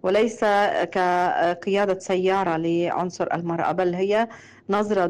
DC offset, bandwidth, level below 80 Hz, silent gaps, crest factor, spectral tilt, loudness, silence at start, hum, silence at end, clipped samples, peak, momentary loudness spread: under 0.1%; 11 kHz; -62 dBFS; none; 10 dB; -5.5 dB/octave; -23 LUFS; 0.05 s; none; 0 s; under 0.1%; -12 dBFS; 5 LU